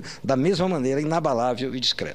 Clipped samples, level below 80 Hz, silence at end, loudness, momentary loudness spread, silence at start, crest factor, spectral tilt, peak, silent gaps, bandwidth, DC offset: under 0.1%; -54 dBFS; 0 s; -23 LUFS; 3 LU; 0 s; 16 dB; -5.5 dB/octave; -8 dBFS; none; 13 kHz; 0.6%